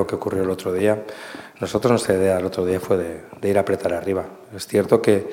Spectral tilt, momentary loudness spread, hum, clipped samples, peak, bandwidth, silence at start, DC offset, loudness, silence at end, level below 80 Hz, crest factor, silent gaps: -6 dB/octave; 13 LU; none; under 0.1%; -2 dBFS; 17 kHz; 0 s; under 0.1%; -21 LUFS; 0 s; -54 dBFS; 20 dB; none